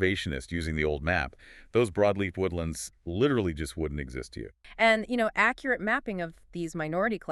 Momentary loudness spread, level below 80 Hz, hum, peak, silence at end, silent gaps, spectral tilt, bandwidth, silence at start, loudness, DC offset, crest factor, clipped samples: 13 LU; -48 dBFS; none; -10 dBFS; 0 s; none; -5.5 dB/octave; 13.5 kHz; 0 s; -29 LUFS; under 0.1%; 20 dB; under 0.1%